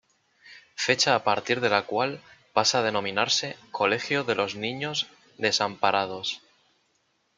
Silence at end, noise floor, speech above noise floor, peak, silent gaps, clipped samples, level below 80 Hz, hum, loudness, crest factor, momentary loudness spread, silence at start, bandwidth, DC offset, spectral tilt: 1 s; -71 dBFS; 45 dB; -6 dBFS; none; under 0.1%; -70 dBFS; none; -25 LUFS; 22 dB; 10 LU; 0.45 s; 9.6 kHz; under 0.1%; -2.5 dB/octave